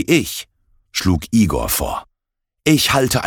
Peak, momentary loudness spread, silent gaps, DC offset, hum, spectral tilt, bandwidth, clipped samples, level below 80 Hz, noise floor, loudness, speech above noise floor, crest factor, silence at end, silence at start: 0 dBFS; 12 LU; none; under 0.1%; none; -4.5 dB/octave; 19 kHz; under 0.1%; -34 dBFS; -78 dBFS; -17 LUFS; 61 dB; 18 dB; 0 s; 0 s